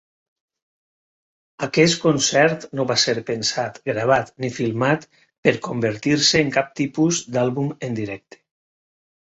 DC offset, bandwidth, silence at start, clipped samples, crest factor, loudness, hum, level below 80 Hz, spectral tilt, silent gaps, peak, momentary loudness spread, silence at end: under 0.1%; 8.4 kHz; 1.6 s; under 0.1%; 20 dB; -20 LUFS; none; -58 dBFS; -4 dB/octave; 5.38-5.43 s; -2 dBFS; 10 LU; 1.2 s